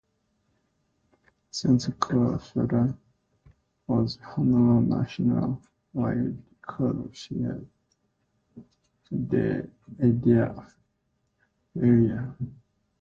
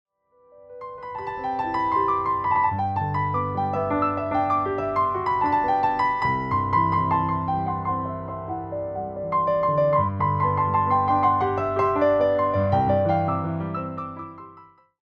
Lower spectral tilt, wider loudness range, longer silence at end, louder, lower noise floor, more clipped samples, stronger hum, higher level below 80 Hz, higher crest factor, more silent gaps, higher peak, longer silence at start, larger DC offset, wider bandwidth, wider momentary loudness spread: about the same, -8 dB/octave vs -9 dB/octave; first, 7 LU vs 4 LU; about the same, 0.5 s vs 0.4 s; second, -26 LUFS vs -23 LUFS; first, -74 dBFS vs -57 dBFS; neither; neither; about the same, -54 dBFS vs -52 dBFS; about the same, 20 dB vs 16 dB; neither; about the same, -8 dBFS vs -8 dBFS; first, 1.55 s vs 0.6 s; neither; about the same, 7.6 kHz vs 7 kHz; first, 17 LU vs 11 LU